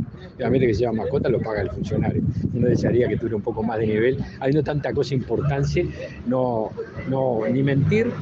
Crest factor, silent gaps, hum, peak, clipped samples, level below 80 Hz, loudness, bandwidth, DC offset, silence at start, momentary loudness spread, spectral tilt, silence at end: 16 dB; none; none; -6 dBFS; under 0.1%; -42 dBFS; -23 LUFS; 7.4 kHz; under 0.1%; 0 s; 7 LU; -8.5 dB/octave; 0 s